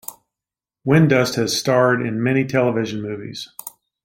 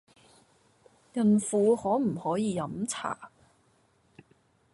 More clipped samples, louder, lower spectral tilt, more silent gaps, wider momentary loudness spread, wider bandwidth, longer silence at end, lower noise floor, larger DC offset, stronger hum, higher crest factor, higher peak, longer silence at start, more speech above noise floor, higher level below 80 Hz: neither; first, -18 LUFS vs -28 LUFS; about the same, -5.5 dB/octave vs -6 dB/octave; neither; first, 17 LU vs 12 LU; first, 16.5 kHz vs 11.5 kHz; second, 0.35 s vs 1.45 s; first, -89 dBFS vs -67 dBFS; neither; neither; about the same, 18 dB vs 16 dB; first, -2 dBFS vs -14 dBFS; second, 0.1 s vs 1.15 s; first, 70 dB vs 40 dB; first, -58 dBFS vs -68 dBFS